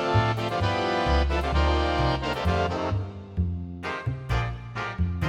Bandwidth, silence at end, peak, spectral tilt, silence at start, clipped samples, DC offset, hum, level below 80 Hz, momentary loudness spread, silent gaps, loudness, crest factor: 10 kHz; 0 s; -8 dBFS; -6.5 dB/octave; 0 s; under 0.1%; under 0.1%; none; -32 dBFS; 9 LU; none; -27 LUFS; 16 dB